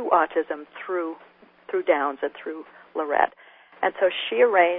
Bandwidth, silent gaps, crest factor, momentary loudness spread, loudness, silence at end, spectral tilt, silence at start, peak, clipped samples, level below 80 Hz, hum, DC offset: 3.9 kHz; none; 22 dB; 14 LU; -25 LUFS; 0 s; -7 dB/octave; 0 s; -4 dBFS; under 0.1%; -68 dBFS; none; under 0.1%